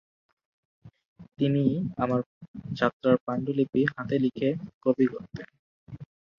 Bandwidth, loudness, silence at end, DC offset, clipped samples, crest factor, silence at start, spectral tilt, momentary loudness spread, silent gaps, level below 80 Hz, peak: 6.6 kHz; -27 LUFS; 0.35 s; under 0.1%; under 0.1%; 22 dB; 0.85 s; -9 dB/octave; 19 LU; 1.05-1.16 s, 2.26-2.41 s, 2.48-2.54 s, 2.93-3.00 s, 3.21-3.27 s, 4.74-4.81 s, 5.59-5.87 s; -62 dBFS; -6 dBFS